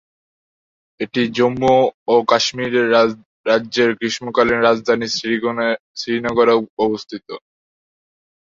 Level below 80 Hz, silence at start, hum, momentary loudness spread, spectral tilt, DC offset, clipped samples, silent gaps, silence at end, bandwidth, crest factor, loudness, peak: -56 dBFS; 1 s; none; 11 LU; -4.5 dB/octave; under 0.1%; under 0.1%; 1.94-2.06 s, 3.26-3.44 s, 5.80-5.94 s, 6.69-6.77 s; 1.1 s; 7.6 kHz; 18 dB; -17 LUFS; -2 dBFS